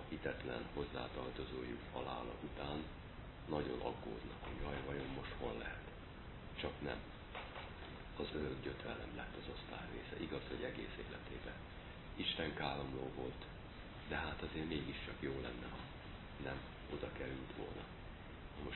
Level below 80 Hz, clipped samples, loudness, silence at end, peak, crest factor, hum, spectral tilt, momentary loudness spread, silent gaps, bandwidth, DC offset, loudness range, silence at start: -56 dBFS; under 0.1%; -47 LUFS; 0 s; -24 dBFS; 22 dB; none; -4 dB/octave; 10 LU; none; 4.2 kHz; under 0.1%; 3 LU; 0 s